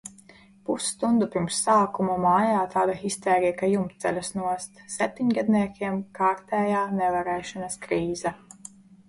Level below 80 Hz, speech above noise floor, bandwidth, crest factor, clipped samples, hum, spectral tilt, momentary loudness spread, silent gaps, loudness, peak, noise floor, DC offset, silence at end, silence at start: -60 dBFS; 28 dB; 11.5 kHz; 16 dB; under 0.1%; none; -5 dB/octave; 12 LU; none; -25 LUFS; -10 dBFS; -53 dBFS; under 0.1%; 0.75 s; 0.05 s